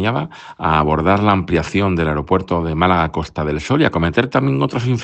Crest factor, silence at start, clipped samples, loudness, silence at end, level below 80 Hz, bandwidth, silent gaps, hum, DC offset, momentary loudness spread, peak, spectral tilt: 16 dB; 0 s; under 0.1%; -17 LUFS; 0 s; -38 dBFS; 8.6 kHz; none; none; under 0.1%; 7 LU; 0 dBFS; -7 dB/octave